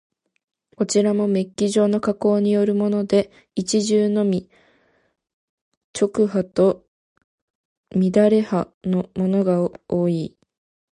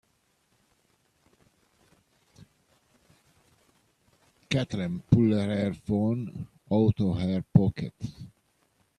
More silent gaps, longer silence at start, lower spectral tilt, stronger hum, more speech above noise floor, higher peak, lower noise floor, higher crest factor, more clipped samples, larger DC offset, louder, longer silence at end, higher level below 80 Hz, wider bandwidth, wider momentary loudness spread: first, 5.33-5.94 s, 6.88-7.16 s, 7.24-7.84 s, 8.74-8.81 s vs none; second, 0.8 s vs 4.5 s; second, -6.5 dB/octave vs -8 dB/octave; neither; second, 41 dB vs 45 dB; about the same, -4 dBFS vs -6 dBFS; second, -61 dBFS vs -70 dBFS; second, 16 dB vs 24 dB; neither; neither; first, -20 LUFS vs -27 LUFS; about the same, 0.7 s vs 0.7 s; second, -58 dBFS vs -52 dBFS; about the same, 11 kHz vs 11 kHz; second, 9 LU vs 17 LU